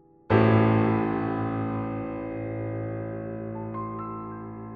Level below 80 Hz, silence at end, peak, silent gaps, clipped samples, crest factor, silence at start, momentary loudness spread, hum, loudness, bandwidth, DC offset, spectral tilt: -52 dBFS; 0 s; -6 dBFS; none; under 0.1%; 20 dB; 0.3 s; 14 LU; none; -27 LUFS; 4.8 kHz; under 0.1%; -7.5 dB/octave